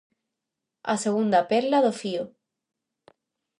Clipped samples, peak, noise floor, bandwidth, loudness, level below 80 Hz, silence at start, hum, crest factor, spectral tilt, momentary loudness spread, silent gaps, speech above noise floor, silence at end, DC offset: under 0.1%; -8 dBFS; -85 dBFS; 11.5 kHz; -24 LUFS; -76 dBFS; 0.85 s; none; 18 dB; -5 dB/octave; 13 LU; none; 62 dB; 1.3 s; under 0.1%